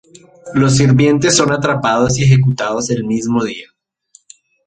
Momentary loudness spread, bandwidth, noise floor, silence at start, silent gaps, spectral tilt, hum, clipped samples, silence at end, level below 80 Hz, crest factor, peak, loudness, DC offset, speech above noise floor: 8 LU; 9.2 kHz; -51 dBFS; 0.45 s; none; -5 dB/octave; none; under 0.1%; 1.05 s; -44 dBFS; 14 dB; 0 dBFS; -13 LUFS; under 0.1%; 38 dB